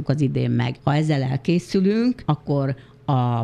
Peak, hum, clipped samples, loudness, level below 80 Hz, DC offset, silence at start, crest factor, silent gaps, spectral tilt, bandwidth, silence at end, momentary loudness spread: -4 dBFS; none; under 0.1%; -22 LUFS; -52 dBFS; under 0.1%; 0 s; 16 dB; none; -8 dB/octave; 10.5 kHz; 0 s; 4 LU